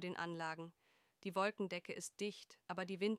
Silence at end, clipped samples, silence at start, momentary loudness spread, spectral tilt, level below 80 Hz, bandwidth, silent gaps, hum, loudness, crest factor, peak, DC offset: 0 s; under 0.1%; 0 s; 11 LU; -4.5 dB/octave; -88 dBFS; 15 kHz; none; none; -44 LUFS; 18 dB; -26 dBFS; under 0.1%